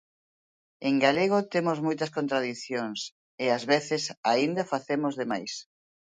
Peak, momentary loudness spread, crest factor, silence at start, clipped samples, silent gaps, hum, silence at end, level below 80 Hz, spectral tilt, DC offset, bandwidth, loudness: -8 dBFS; 10 LU; 22 dB; 0.8 s; under 0.1%; 3.12-3.38 s, 4.17-4.23 s; none; 0.5 s; -74 dBFS; -4.5 dB/octave; under 0.1%; 9.4 kHz; -28 LUFS